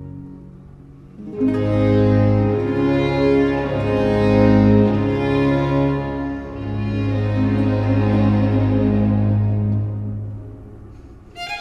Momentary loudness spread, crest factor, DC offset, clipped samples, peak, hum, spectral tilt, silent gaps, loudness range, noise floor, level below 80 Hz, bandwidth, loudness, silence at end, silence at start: 15 LU; 16 dB; under 0.1%; under 0.1%; -2 dBFS; none; -9.5 dB/octave; none; 3 LU; -41 dBFS; -34 dBFS; 6.2 kHz; -18 LUFS; 0 s; 0 s